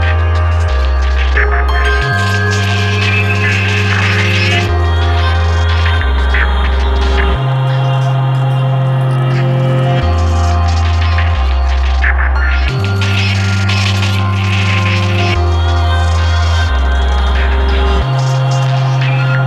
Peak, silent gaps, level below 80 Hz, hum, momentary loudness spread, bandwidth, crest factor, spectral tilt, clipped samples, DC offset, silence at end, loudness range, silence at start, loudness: 0 dBFS; none; -16 dBFS; none; 2 LU; 9.6 kHz; 10 dB; -6 dB/octave; under 0.1%; under 0.1%; 0 s; 1 LU; 0 s; -12 LUFS